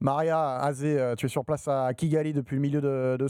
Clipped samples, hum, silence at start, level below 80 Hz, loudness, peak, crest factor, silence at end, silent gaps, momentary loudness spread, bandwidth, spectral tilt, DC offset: under 0.1%; none; 0 s; -62 dBFS; -27 LUFS; -10 dBFS; 16 dB; 0 s; none; 3 LU; 15 kHz; -7.5 dB/octave; under 0.1%